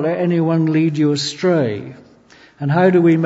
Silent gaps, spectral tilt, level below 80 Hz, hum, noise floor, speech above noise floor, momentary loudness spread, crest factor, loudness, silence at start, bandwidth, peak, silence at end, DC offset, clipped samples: none; -7 dB/octave; -62 dBFS; none; -47 dBFS; 32 dB; 12 LU; 16 dB; -16 LUFS; 0 s; 8 kHz; -2 dBFS; 0 s; under 0.1%; under 0.1%